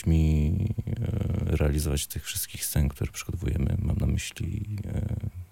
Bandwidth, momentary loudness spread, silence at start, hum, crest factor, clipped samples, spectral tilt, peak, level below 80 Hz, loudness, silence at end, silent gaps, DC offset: 17 kHz; 8 LU; 0 s; none; 14 dB; under 0.1%; -5.5 dB/octave; -12 dBFS; -34 dBFS; -29 LUFS; 0.05 s; none; 0.1%